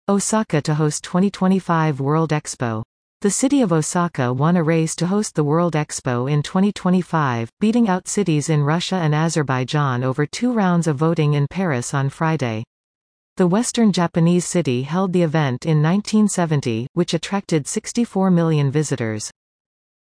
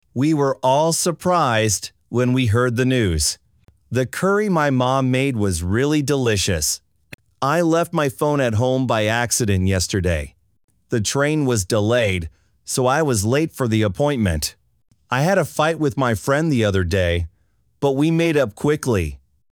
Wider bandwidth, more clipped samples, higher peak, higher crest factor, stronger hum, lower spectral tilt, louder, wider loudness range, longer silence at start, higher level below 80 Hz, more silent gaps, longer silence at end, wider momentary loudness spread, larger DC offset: second, 10.5 kHz vs over 20 kHz; neither; about the same, -4 dBFS vs -4 dBFS; about the same, 14 dB vs 16 dB; neither; about the same, -6 dB/octave vs -5 dB/octave; about the same, -19 LUFS vs -19 LUFS; about the same, 2 LU vs 1 LU; about the same, 0.1 s vs 0.15 s; second, -56 dBFS vs -40 dBFS; first, 2.85-3.20 s, 7.53-7.57 s, 12.67-13.36 s, 16.89-16.95 s vs 7.14-7.18 s, 10.64-10.68 s; first, 0.7 s vs 0.35 s; about the same, 6 LU vs 7 LU; neither